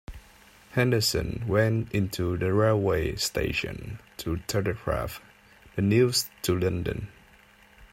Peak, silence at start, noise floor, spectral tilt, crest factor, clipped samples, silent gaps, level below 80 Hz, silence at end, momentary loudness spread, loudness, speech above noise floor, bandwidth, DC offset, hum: -10 dBFS; 0.1 s; -56 dBFS; -5 dB/octave; 18 dB; under 0.1%; none; -46 dBFS; 0.1 s; 14 LU; -27 LUFS; 30 dB; 16 kHz; under 0.1%; none